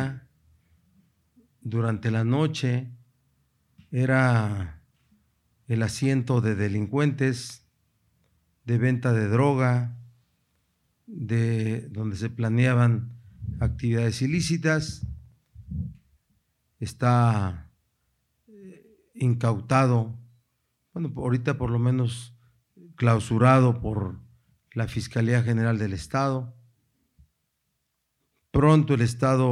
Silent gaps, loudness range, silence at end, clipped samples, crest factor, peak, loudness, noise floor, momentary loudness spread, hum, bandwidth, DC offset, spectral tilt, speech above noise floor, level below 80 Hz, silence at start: none; 5 LU; 0 s; under 0.1%; 22 dB; -4 dBFS; -25 LUFS; -77 dBFS; 17 LU; none; 11.5 kHz; under 0.1%; -7 dB/octave; 54 dB; -48 dBFS; 0 s